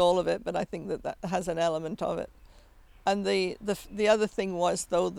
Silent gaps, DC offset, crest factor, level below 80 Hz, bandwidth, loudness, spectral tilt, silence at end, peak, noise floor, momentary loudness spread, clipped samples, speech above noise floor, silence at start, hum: none; under 0.1%; 18 dB; -54 dBFS; 16.5 kHz; -29 LUFS; -4.5 dB/octave; 0 s; -12 dBFS; -55 dBFS; 9 LU; under 0.1%; 26 dB; 0 s; none